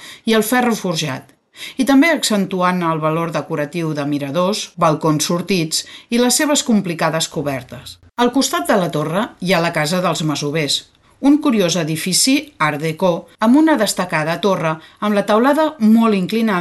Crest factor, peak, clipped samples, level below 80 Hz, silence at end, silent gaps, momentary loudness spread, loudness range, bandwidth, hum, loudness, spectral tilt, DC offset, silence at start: 14 dB; -4 dBFS; under 0.1%; -56 dBFS; 0 s; none; 8 LU; 3 LU; 12.5 kHz; none; -16 LUFS; -4 dB/octave; under 0.1%; 0 s